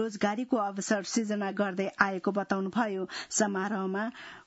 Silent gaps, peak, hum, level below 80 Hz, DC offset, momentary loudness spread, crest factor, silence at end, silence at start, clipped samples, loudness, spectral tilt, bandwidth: none; -6 dBFS; none; -74 dBFS; under 0.1%; 4 LU; 24 dB; 0.05 s; 0 s; under 0.1%; -30 LUFS; -4 dB/octave; 8.2 kHz